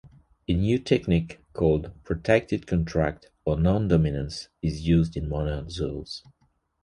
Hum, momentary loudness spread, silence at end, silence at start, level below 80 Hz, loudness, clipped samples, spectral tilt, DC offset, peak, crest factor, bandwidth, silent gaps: none; 10 LU; 0.65 s; 0.05 s; -38 dBFS; -26 LUFS; under 0.1%; -7.5 dB/octave; under 0.1%; -6 dBFS; 20 dB; 10.5 kHz; none